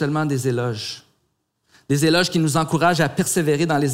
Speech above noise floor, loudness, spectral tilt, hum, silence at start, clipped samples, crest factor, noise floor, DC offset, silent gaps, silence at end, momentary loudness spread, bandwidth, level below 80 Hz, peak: 51 dB; -20 LUFS; -5 dB/octave; none; 0 s; under 0.1%; 16 dB; -70 dBFS; under 0.1%; none; 0 s; 9 LU; 16 kHz; -58 dBFS; -4 dBFS